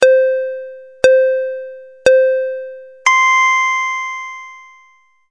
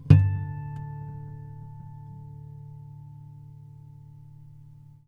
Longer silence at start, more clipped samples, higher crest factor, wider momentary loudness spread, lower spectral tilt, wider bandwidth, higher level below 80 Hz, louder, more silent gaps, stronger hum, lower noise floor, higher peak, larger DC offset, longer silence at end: about the same, 0 s vs 0 s; neither; second, 14 dB vs 28 dB; about the same, 20 LU vs 20 LU; second, -1 dB/octave vs -10 dB/octave; first, 10.5 kHz vs 5.2 kHz; second, -58 dBFS vs -48 dBFS; first, -14 LUFS vs -27 LUFS; neither; neither; about the same, -52 dBFS vs -49 dBFS; about the same, 0 dBFS vs 0 dBFS; first, 0.2% vs under 0.1%; about the same, 0.7 s vs 0.65 s